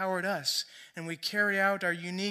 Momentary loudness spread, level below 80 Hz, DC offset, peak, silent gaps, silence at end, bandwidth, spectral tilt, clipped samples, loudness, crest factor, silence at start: 14 LU; -86 dBFS; under 0.1%; -14 dBFS; none; 0 s; 15.5 kHz; -3 dB/octave; under 0.1%; -30 LUFS; 16 dB; 0 s